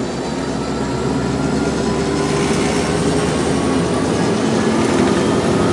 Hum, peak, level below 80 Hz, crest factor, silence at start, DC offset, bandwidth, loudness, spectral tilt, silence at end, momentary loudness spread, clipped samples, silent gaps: none; -2 dBFS; -36 dBFS; 14 dB; 0 s; under 0.1%; 11.5 kHz; -17 LUFS; -5.5 dB/octave; 0 s; 6 LU; under 0.1%; none